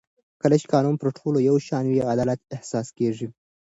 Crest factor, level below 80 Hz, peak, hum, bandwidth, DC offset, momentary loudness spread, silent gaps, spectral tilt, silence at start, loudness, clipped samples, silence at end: 18 dB; -60 dBFS; -6 dBFS; none; 8 kHz; under 0.1%; 10 LU; none; -7.5 dB/octave; 0.45 s; -23 LUFS; under 0.1%; 0.4 s